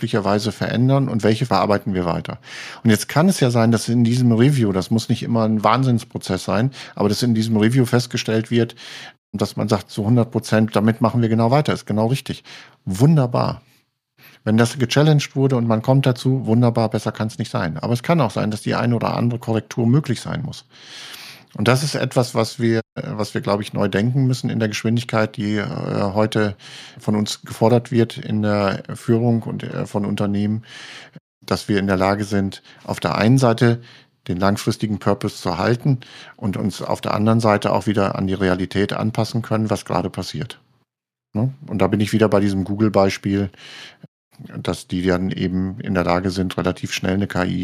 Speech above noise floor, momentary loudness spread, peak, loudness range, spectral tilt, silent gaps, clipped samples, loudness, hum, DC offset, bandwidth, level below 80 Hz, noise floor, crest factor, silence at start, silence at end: 64 dB; 12 LU; 0 dBFS; 4 LU; -6.5 dB/octave; 9.18-9.33 s, 22.92-22.96 s, 31.20-31.41 s, 44.08-44.31 s; under 0.1%; -20 LUFS; none; under 0.1%; 15 kHz; -54 dBFS; -83 dBFS; 18 dB; 0 s; 0 s